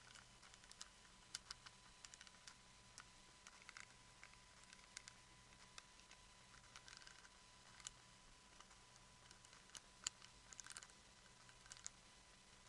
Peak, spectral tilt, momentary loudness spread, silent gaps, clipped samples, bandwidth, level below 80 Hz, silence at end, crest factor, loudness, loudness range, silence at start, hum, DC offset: -24 dBFS; -0.5 dB/octave; 10 LU; none; under 0.1%; 12 kHz; -76 dBFS; 0 s; 38 dB; -60 LUFS; 5 LU; 0 s; none; under 0.1%